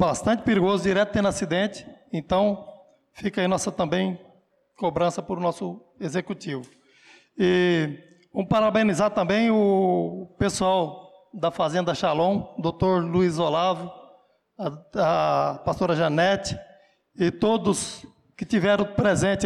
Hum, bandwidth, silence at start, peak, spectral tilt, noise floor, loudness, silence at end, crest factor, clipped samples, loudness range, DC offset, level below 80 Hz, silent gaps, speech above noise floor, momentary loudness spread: none; 12.5 kHz; 0 s; -12 dBFS; -5.5 dB/octave; -61 dBFS; -24 LUFS; 0 s; 12 dB; under 0.1%; 5 LU; under 0.1%; -52 dBFS; none; 37 dB; 13 LU